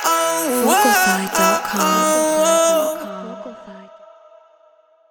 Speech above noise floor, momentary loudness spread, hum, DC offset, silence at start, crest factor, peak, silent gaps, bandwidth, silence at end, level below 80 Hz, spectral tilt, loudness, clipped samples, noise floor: 38 dB; 17 LU; none; under 0.1%; 0 s; 16 dB; -2 dBFS; none; over 20 kHz; 1.25 s; -58 dBFS; -2.5 dB/octave; -16 LUFS; under 0.1%; -54 dBFS